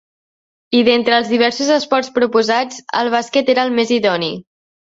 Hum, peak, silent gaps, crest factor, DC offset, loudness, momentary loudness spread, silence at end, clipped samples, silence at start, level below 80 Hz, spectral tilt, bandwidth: none; -2 dBFS; none; 14 dB; under 0.1%; -15 LUFS; 6 LU; 0.45 s; under 0.1%; 0.7 s; -60 dBFS; -3.5 dB/octave; 7.8 kHz